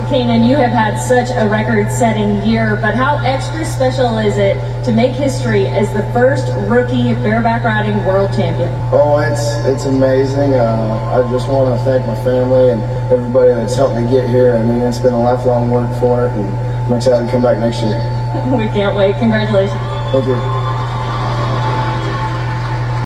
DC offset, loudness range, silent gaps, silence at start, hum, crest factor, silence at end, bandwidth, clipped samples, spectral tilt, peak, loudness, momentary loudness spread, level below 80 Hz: under 0.1%; 2 LU; none; 0 s; none; 12 dB; 0 s; 12 kHz; under 0.1%; -7 dB/octave; 0 dBFS; -14 LUFS; 6 LU; -32 dBFS